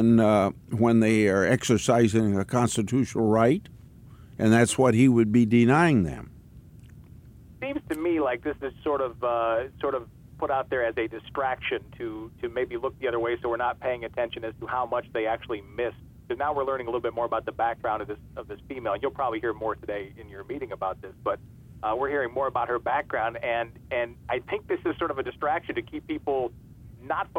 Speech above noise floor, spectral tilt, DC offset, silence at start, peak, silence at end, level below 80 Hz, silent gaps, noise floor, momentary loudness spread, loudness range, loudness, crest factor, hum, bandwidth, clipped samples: 23 dB; -6 dB/octave; under 0.1%; 0 s; -6 dBFS; 0 s; -52 dBFS; none; -48 dBFS; 14 LU; 8 LU; -26 LUFS; 20 dB; none; 16 kHz; under 0.1%